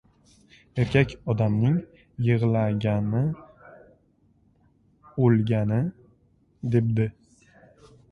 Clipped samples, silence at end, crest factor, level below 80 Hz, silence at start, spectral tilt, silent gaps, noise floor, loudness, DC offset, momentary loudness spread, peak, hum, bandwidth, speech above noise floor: under 0.1%; 1 s; 20 dB; -52 dBFS; 0.75 s; -9 dB/octave; none; -63 dBFS; -25 LUFS; under 0.1%; 11 LU; -6 dBFS; none; 6.6 kHz; 40 dB